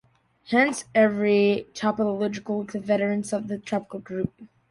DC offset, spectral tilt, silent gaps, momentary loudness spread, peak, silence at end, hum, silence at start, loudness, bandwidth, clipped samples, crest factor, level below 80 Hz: under 0.1%; -5.5 dB/octave; none; 10 LU; -6 dBFS; 0.25 s; none; 0.5 s; -25 LUFS; 11.5 kHz; under 0.1%; 18 dB; -60 dBFS